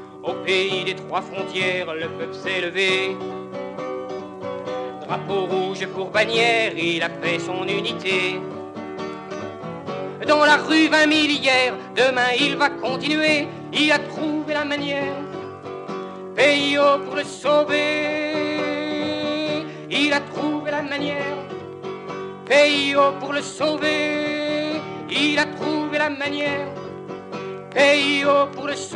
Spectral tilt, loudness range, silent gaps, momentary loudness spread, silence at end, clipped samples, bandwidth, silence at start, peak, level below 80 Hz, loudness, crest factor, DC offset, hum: -4 dB/octave; 6 LU; none; 15 LU; 0 s; under 0.1%; 11 kHz; 0 s; -2 dBFS; -68 dBFS; -21 LUFS; 18 dB; under 0.1%; none